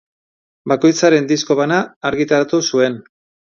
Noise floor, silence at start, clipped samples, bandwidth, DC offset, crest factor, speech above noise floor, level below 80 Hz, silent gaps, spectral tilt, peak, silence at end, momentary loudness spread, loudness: under -90 dBFS; 0.65 s; under 0.1%; 7.4 kHz; under 0.1%; 16 dB; over 75 dB; -58 dBFS; 1.96-2.01 s; -4.5 dB/octave; 0 dBFS; 0.45 s; 8 LU; -15 LUFS